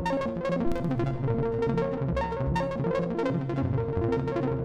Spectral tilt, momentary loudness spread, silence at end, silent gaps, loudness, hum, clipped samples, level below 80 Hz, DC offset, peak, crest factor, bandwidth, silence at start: -8.5 dB/octave; 2 LU; 0 s; none; -29 LUFS; none; under 0.1%; -42 dBFS; under 0.1%; -16 dBFS; 12 dB; 9.6 kHz; 0 s